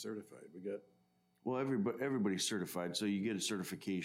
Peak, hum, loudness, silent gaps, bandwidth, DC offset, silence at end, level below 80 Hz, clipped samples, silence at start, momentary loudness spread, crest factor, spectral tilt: -24 dBFS; none; -39 LUFS; none; 16 kHz; under 0.1%; 0 s; -86 dBFS; under 0.1%; 0 s; 12 LU; 16 dB; -4.5 dB/octave